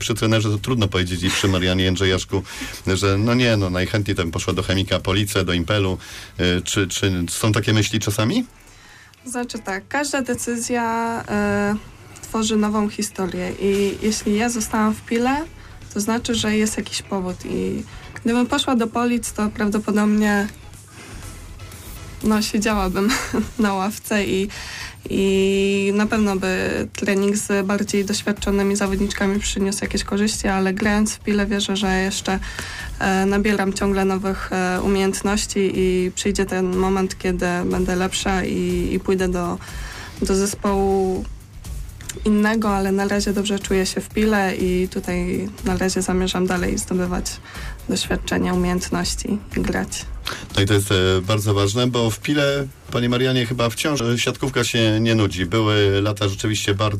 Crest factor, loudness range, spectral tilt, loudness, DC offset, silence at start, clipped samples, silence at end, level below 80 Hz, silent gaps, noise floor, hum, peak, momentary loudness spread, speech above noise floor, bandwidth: 12 dB; 3 LU; -4.5 dB/octave; -21 LUFS; under 0.1%; 0 s; under 0.1%; 0 s; -38 dBFS; none; -46 dBFS; none; -10 dBFS; 9 LU; 26 dB; 15.5 kHz